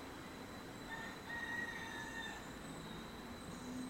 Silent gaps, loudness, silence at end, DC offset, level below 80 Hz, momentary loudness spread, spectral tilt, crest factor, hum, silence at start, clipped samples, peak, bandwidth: none; -47 LUFS; 0 s; under 0.1%; -64 dBFS; 8 LU; -4 dB/octave; 14 dB; none; 0 s; under 0.1%; -32 dBFS; 16 kHz